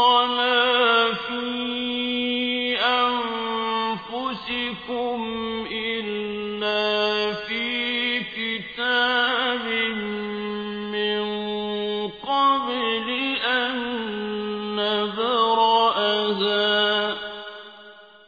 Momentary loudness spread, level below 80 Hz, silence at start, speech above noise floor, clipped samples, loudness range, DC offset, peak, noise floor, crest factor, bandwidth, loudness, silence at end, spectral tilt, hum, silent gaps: 10 LU; -60 dBFS; 0 s; 19 dB; under 0.1%; 4 LU; under 0.1%; -6 dBFS; -46 dBFS; 18 dB; 5 kHz; -23 LUFS; 0.2 s; -5 dB/octave; none; none